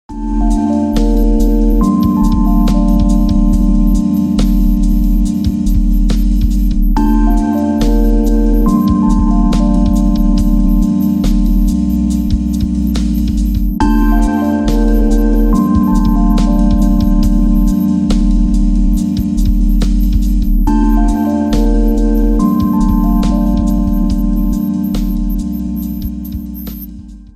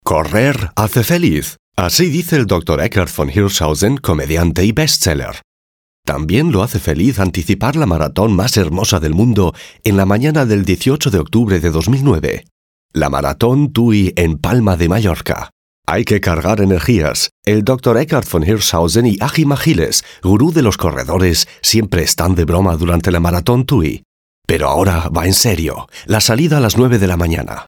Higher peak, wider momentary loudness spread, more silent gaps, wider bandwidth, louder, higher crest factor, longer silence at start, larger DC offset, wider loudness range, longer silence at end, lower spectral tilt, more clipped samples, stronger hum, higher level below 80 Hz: about the same, 0 dBFS vs 0 dBFS; about the same, 4 LU vs 6 LU; second, none vs 1.59-1.72 s, 5.44-6.03 s, 12.51-12.89 s, 15.52-15.83 s, 17.31-17.43 s, 24.05-24.42 s; second, 14 kHz vs 19 kHz; about the same, -13 LUFS vs -14 LUFS; about the same, 10 dB vs 14 dB; about the same, 0.1 s vs 0.05 s; neither; about the same, 2 LU vs 2 LU; about the same, 0.1 s vs 0.05 s; first, -8 dB/octave vs -5 dB/octave; neither; neither; first, -14 dBFS vs -28 dBFS